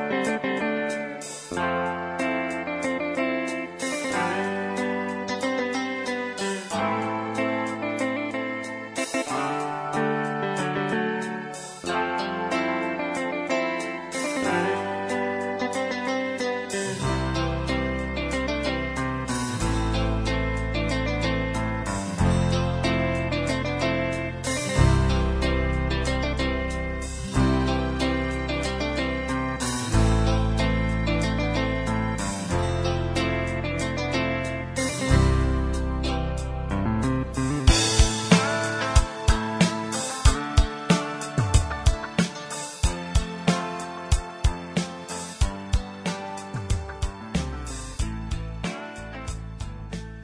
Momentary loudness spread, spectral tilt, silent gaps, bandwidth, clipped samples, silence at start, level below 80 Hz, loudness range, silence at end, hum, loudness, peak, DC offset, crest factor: 8 LU; -5 dB/octave; none; 11 kHz; under 0.1%; 0 s; -32 dBFS; 5 LU; 0 s; none; -26 LUFS; -2 dBFS; under 0.1%; 22 dB